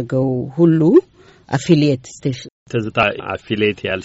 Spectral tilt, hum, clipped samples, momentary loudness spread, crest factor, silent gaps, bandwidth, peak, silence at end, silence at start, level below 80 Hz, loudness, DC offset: -6 dB/octave; none; under 0.1%; 11 LU; 16 dB; 2.52-2.66 s; 8 kHz; -2 dBFS; 0 s; 0 s; -52 dBFS; -17 LUFS; under 0.1%